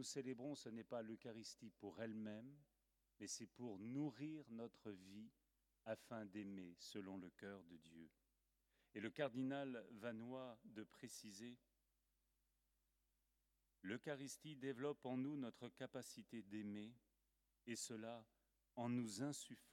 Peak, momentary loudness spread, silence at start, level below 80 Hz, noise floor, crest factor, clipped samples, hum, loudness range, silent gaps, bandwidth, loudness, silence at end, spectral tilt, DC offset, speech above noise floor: -30 dBFS; 13 LU; 0 s; -90 dBFS; -87 dBFS; 24 dB; under 0.1%; none; 6 LU; none; 17.5 kHz; -53 LUFS; 0 s; -4.5 dB/octave; under 0.1%; 35 dB